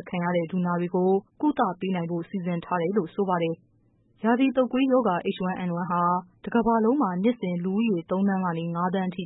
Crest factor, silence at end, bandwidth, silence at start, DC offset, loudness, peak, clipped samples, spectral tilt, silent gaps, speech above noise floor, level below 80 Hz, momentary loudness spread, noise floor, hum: 14 dB; 0 s; 4 kHz; 0 s; under 0.1%; -26 LUFS; -10 dBFS; under 0.1%; -12 dB/octave; none; 38 dB; -62 dBFS; 7 LU; -63 dBFS; none